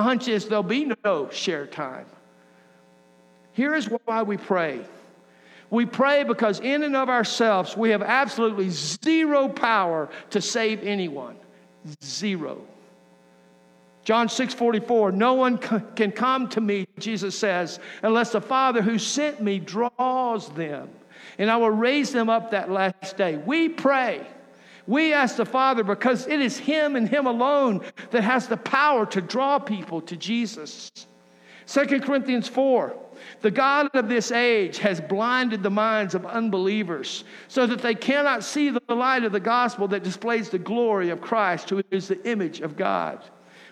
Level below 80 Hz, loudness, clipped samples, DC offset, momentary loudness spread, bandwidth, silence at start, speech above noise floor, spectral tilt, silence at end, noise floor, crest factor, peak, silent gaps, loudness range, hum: -82 dBFS; -23 LUFS; under 0.1%; under 0.1%; 11 LU; 12 kHz; 0 s; 32 dB; -4.5 dB/octave; 0.05 s; -56 dBFS; 18 dB; -6 dBFS; none; 6 LU; none